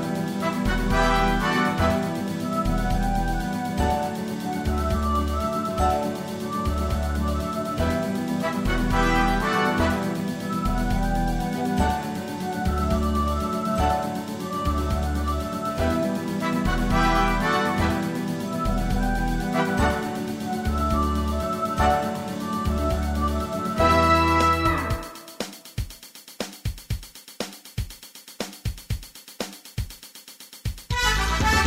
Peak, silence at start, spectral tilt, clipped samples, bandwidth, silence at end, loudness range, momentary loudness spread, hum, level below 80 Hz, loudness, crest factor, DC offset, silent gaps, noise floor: -8 dBFS; 0 s; -5.5 dB/octave; under 0.1%; 16 kHz; 0 s; 12 LU; 13 LU; none; -30 dBFS; -25 LUFS; 16 dB; under 0.1%; none; -45 dBFS